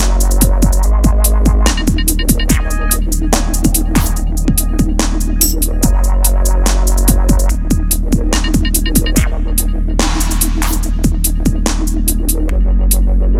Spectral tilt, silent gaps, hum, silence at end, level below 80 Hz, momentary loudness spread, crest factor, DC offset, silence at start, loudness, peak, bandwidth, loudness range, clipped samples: -4.5 dB/octave; none; none; 0 s; -12 dBFS; 4 LU; 12 dB; under 0.1%; 0 s; -14 LUFS; 0 dBFS; 16 kHz; 2 LU; under 0.1%